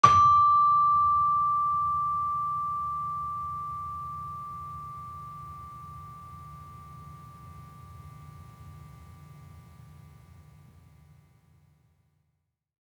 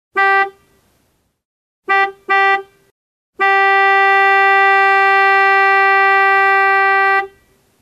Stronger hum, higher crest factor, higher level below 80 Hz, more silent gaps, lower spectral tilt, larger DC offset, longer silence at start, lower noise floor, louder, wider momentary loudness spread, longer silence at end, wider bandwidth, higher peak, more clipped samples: neither; first, 24 dB vs 14 dB; about the same, -58 dBFS vs -62 dBFS; second, none vs 1.45-1.83 s, 2.91-3.33 s; first, -4.5 dB/octave vs -2 dB/octave; neither; about the same, 0.05 s vs 0.15 s; first, -78 dBFS vs -62 dBFS; second, -25 LUFS vs -11 LUFS; first, 28 LU vs 6 LU; first, 3.25 s vs 0.55 s; second, 10 kHz vs 13 kHz; second, -4 dBFS vs 0 dBFS; neither